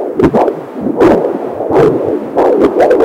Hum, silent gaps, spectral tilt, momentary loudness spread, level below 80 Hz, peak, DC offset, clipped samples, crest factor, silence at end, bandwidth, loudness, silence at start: none; none; -8 dB/octave; 8 LU; -38 dBFS; 0 dBFS; under 0.1%; under 0.1%; 10 dB; 0 s; 15 kHz; -11 LUFS; 0 s